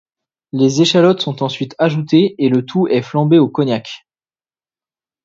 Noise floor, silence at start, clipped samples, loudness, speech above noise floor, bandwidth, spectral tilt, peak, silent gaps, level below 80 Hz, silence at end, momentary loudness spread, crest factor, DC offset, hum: under -90 dBFS; 0.55 s; under 0.1%; -14 LUFS; over 76 dB; 7.8 kHz; -6 dB/octave; 0 dBFS; none; -62 dBFS; 1.25 s; 10 LU; 16 dB; under 0.1%; none